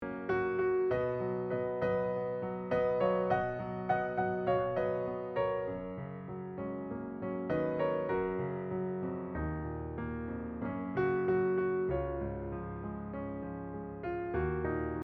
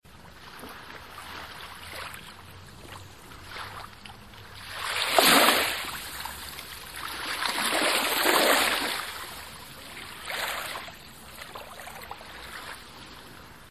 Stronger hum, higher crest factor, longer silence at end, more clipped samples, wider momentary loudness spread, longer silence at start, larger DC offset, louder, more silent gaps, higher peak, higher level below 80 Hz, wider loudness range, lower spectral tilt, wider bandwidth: neither; second, 16 dB vs 26 dB; about the same, 0 s vs 0 s; neither; second, 10 LU vs 24 LU; about the same, 0 s vs 0.05 s; second, under 0.1% vs 0.2%; second, -35 LUFS vs -25 LUFS; neither; second, -18 dBFS vs -4 dBFS; about the same, -54 dBFS vs -56 dBFS; second, 4 LU vs 17 LU; first, -10 dB/octave vs -1 dB/octave; second, 4.8 kHz vs 14.5 kHz